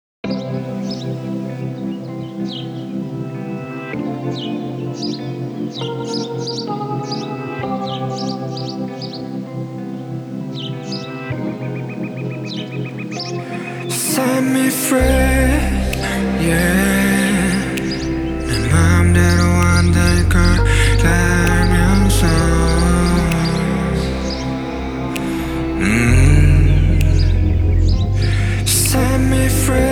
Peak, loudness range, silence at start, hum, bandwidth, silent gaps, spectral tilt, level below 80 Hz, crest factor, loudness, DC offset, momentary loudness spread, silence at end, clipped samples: 0 dBFS; 11 LU; 0.25 s; none; 19.5 kHz; none; -5.5 dB/octave; -22 dBFS; 16 dB; -17 LUFS; under 0.1%; 12 LU; 0 s; under 0.1%